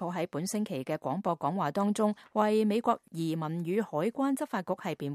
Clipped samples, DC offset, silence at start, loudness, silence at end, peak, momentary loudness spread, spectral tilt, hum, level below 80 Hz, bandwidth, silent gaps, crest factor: under 0.1%; under 0.1%; 0 s; -31 LUFS; 0 s; -12 dBFS; 7 LU; -6 dB/octave; none; -78 dBFS; 15 kHz; none; 18 dB